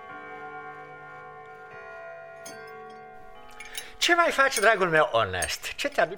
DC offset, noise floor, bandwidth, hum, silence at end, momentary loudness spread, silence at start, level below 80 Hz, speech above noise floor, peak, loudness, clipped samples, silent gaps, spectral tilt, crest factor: 0.2%; -47 dBFS; 19.5 kHz; none; 0 s; 23 LU; 0 s; -58 dBFS; 23 dB; -6 dBFS; -23 LUFS; under 0.1%; none; -2.5 dB/octave; 22 dB